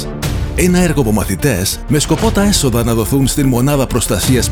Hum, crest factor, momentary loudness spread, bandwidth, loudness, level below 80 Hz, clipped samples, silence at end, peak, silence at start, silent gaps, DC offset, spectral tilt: none; 14 dB; 3 LU; over 20 kHz; -14 LUFS; -24 dBFS; under 0.1%; 0 s; 0 dBFS; 0 s; none; 0.5%; -5 dB/octave